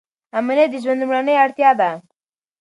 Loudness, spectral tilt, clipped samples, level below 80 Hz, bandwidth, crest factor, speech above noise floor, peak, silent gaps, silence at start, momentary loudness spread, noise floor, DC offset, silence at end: -17 LUFS; -5.5 dB/octave; under 0.1%; -76 dBFS; 11 kHz; 16 dB; 60 dB; -2 dBFS; none; 0.35 s; 10 LU; -77 dBFS; under 0.1%; 0.6 s